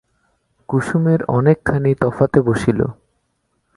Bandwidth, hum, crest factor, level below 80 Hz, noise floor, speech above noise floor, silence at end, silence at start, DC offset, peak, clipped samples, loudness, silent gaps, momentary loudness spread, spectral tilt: 11.5 kHz; none; 18 dB; -44 dBFS; -68 dBFS; 52 dB; 0.85 s; 0.7 s; under 0.1%; 0 dBFS; under 0.1%; -17 LUFS; none; 6 LU; -8.5 dB/octave